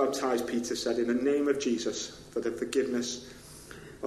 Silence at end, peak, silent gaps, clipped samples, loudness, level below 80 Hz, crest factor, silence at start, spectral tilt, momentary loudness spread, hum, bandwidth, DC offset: 0 s; -14 dBFS; none; under 0.1%; -30 LUFS; -62 dBFS; 16 dB; 0 s; -3.5 dB/octave; 19 LU; none; 13 kHz; under 0.1%